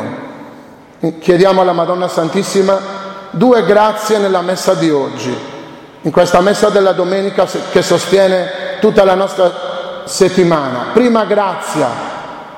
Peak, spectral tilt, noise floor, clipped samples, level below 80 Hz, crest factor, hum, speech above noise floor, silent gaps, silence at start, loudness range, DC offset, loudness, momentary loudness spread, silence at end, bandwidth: 0 dBFS; -5 dB/octave; -37 dBFS; under 0.1%; -48 dBFS; 12 dB; none; 25 dB; none; 0 s; 2 LU; under 0.1%; -12 LUFS; 14 LU; 0 s; 16.5 kHz